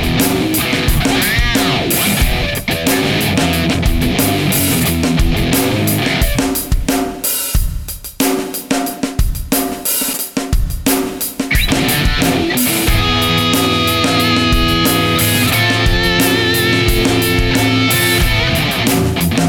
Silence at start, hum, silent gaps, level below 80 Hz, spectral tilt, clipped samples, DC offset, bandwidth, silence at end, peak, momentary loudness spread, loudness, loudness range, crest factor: 0 s; none; none; -22 dBFS; -4 dB/octave; under 0.1%; under 0.1%; 19.5 kHz; 0 s; -2 dBFS; 6 LU; -14 LUFS; 5 LU; 12 dB